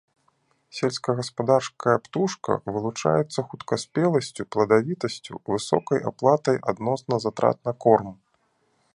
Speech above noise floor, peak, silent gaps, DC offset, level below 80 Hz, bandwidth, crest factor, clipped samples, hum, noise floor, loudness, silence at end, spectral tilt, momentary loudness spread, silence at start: 45 dB; -2 dBFS; none; under 0.1%; -62 dBFS; 11 kHz; 22 dB; under 0.1%; none; -68 dBFS; -24 LUFS; 0.8 s; -5.5 dB/octave; 9 LU; 0.75 s